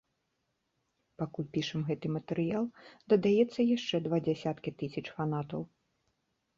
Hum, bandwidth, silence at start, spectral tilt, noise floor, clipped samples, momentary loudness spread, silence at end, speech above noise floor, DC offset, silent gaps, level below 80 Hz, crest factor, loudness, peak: none; 7.6 kHz; 1.2 s; -7 dB/octave; -81 dBFS; under 0.1%; 12 LU; 0.9 s; 49 dB; under 0.1%; none; -70 dBFS; 20 dB; -33 LUFS; -14 dBFS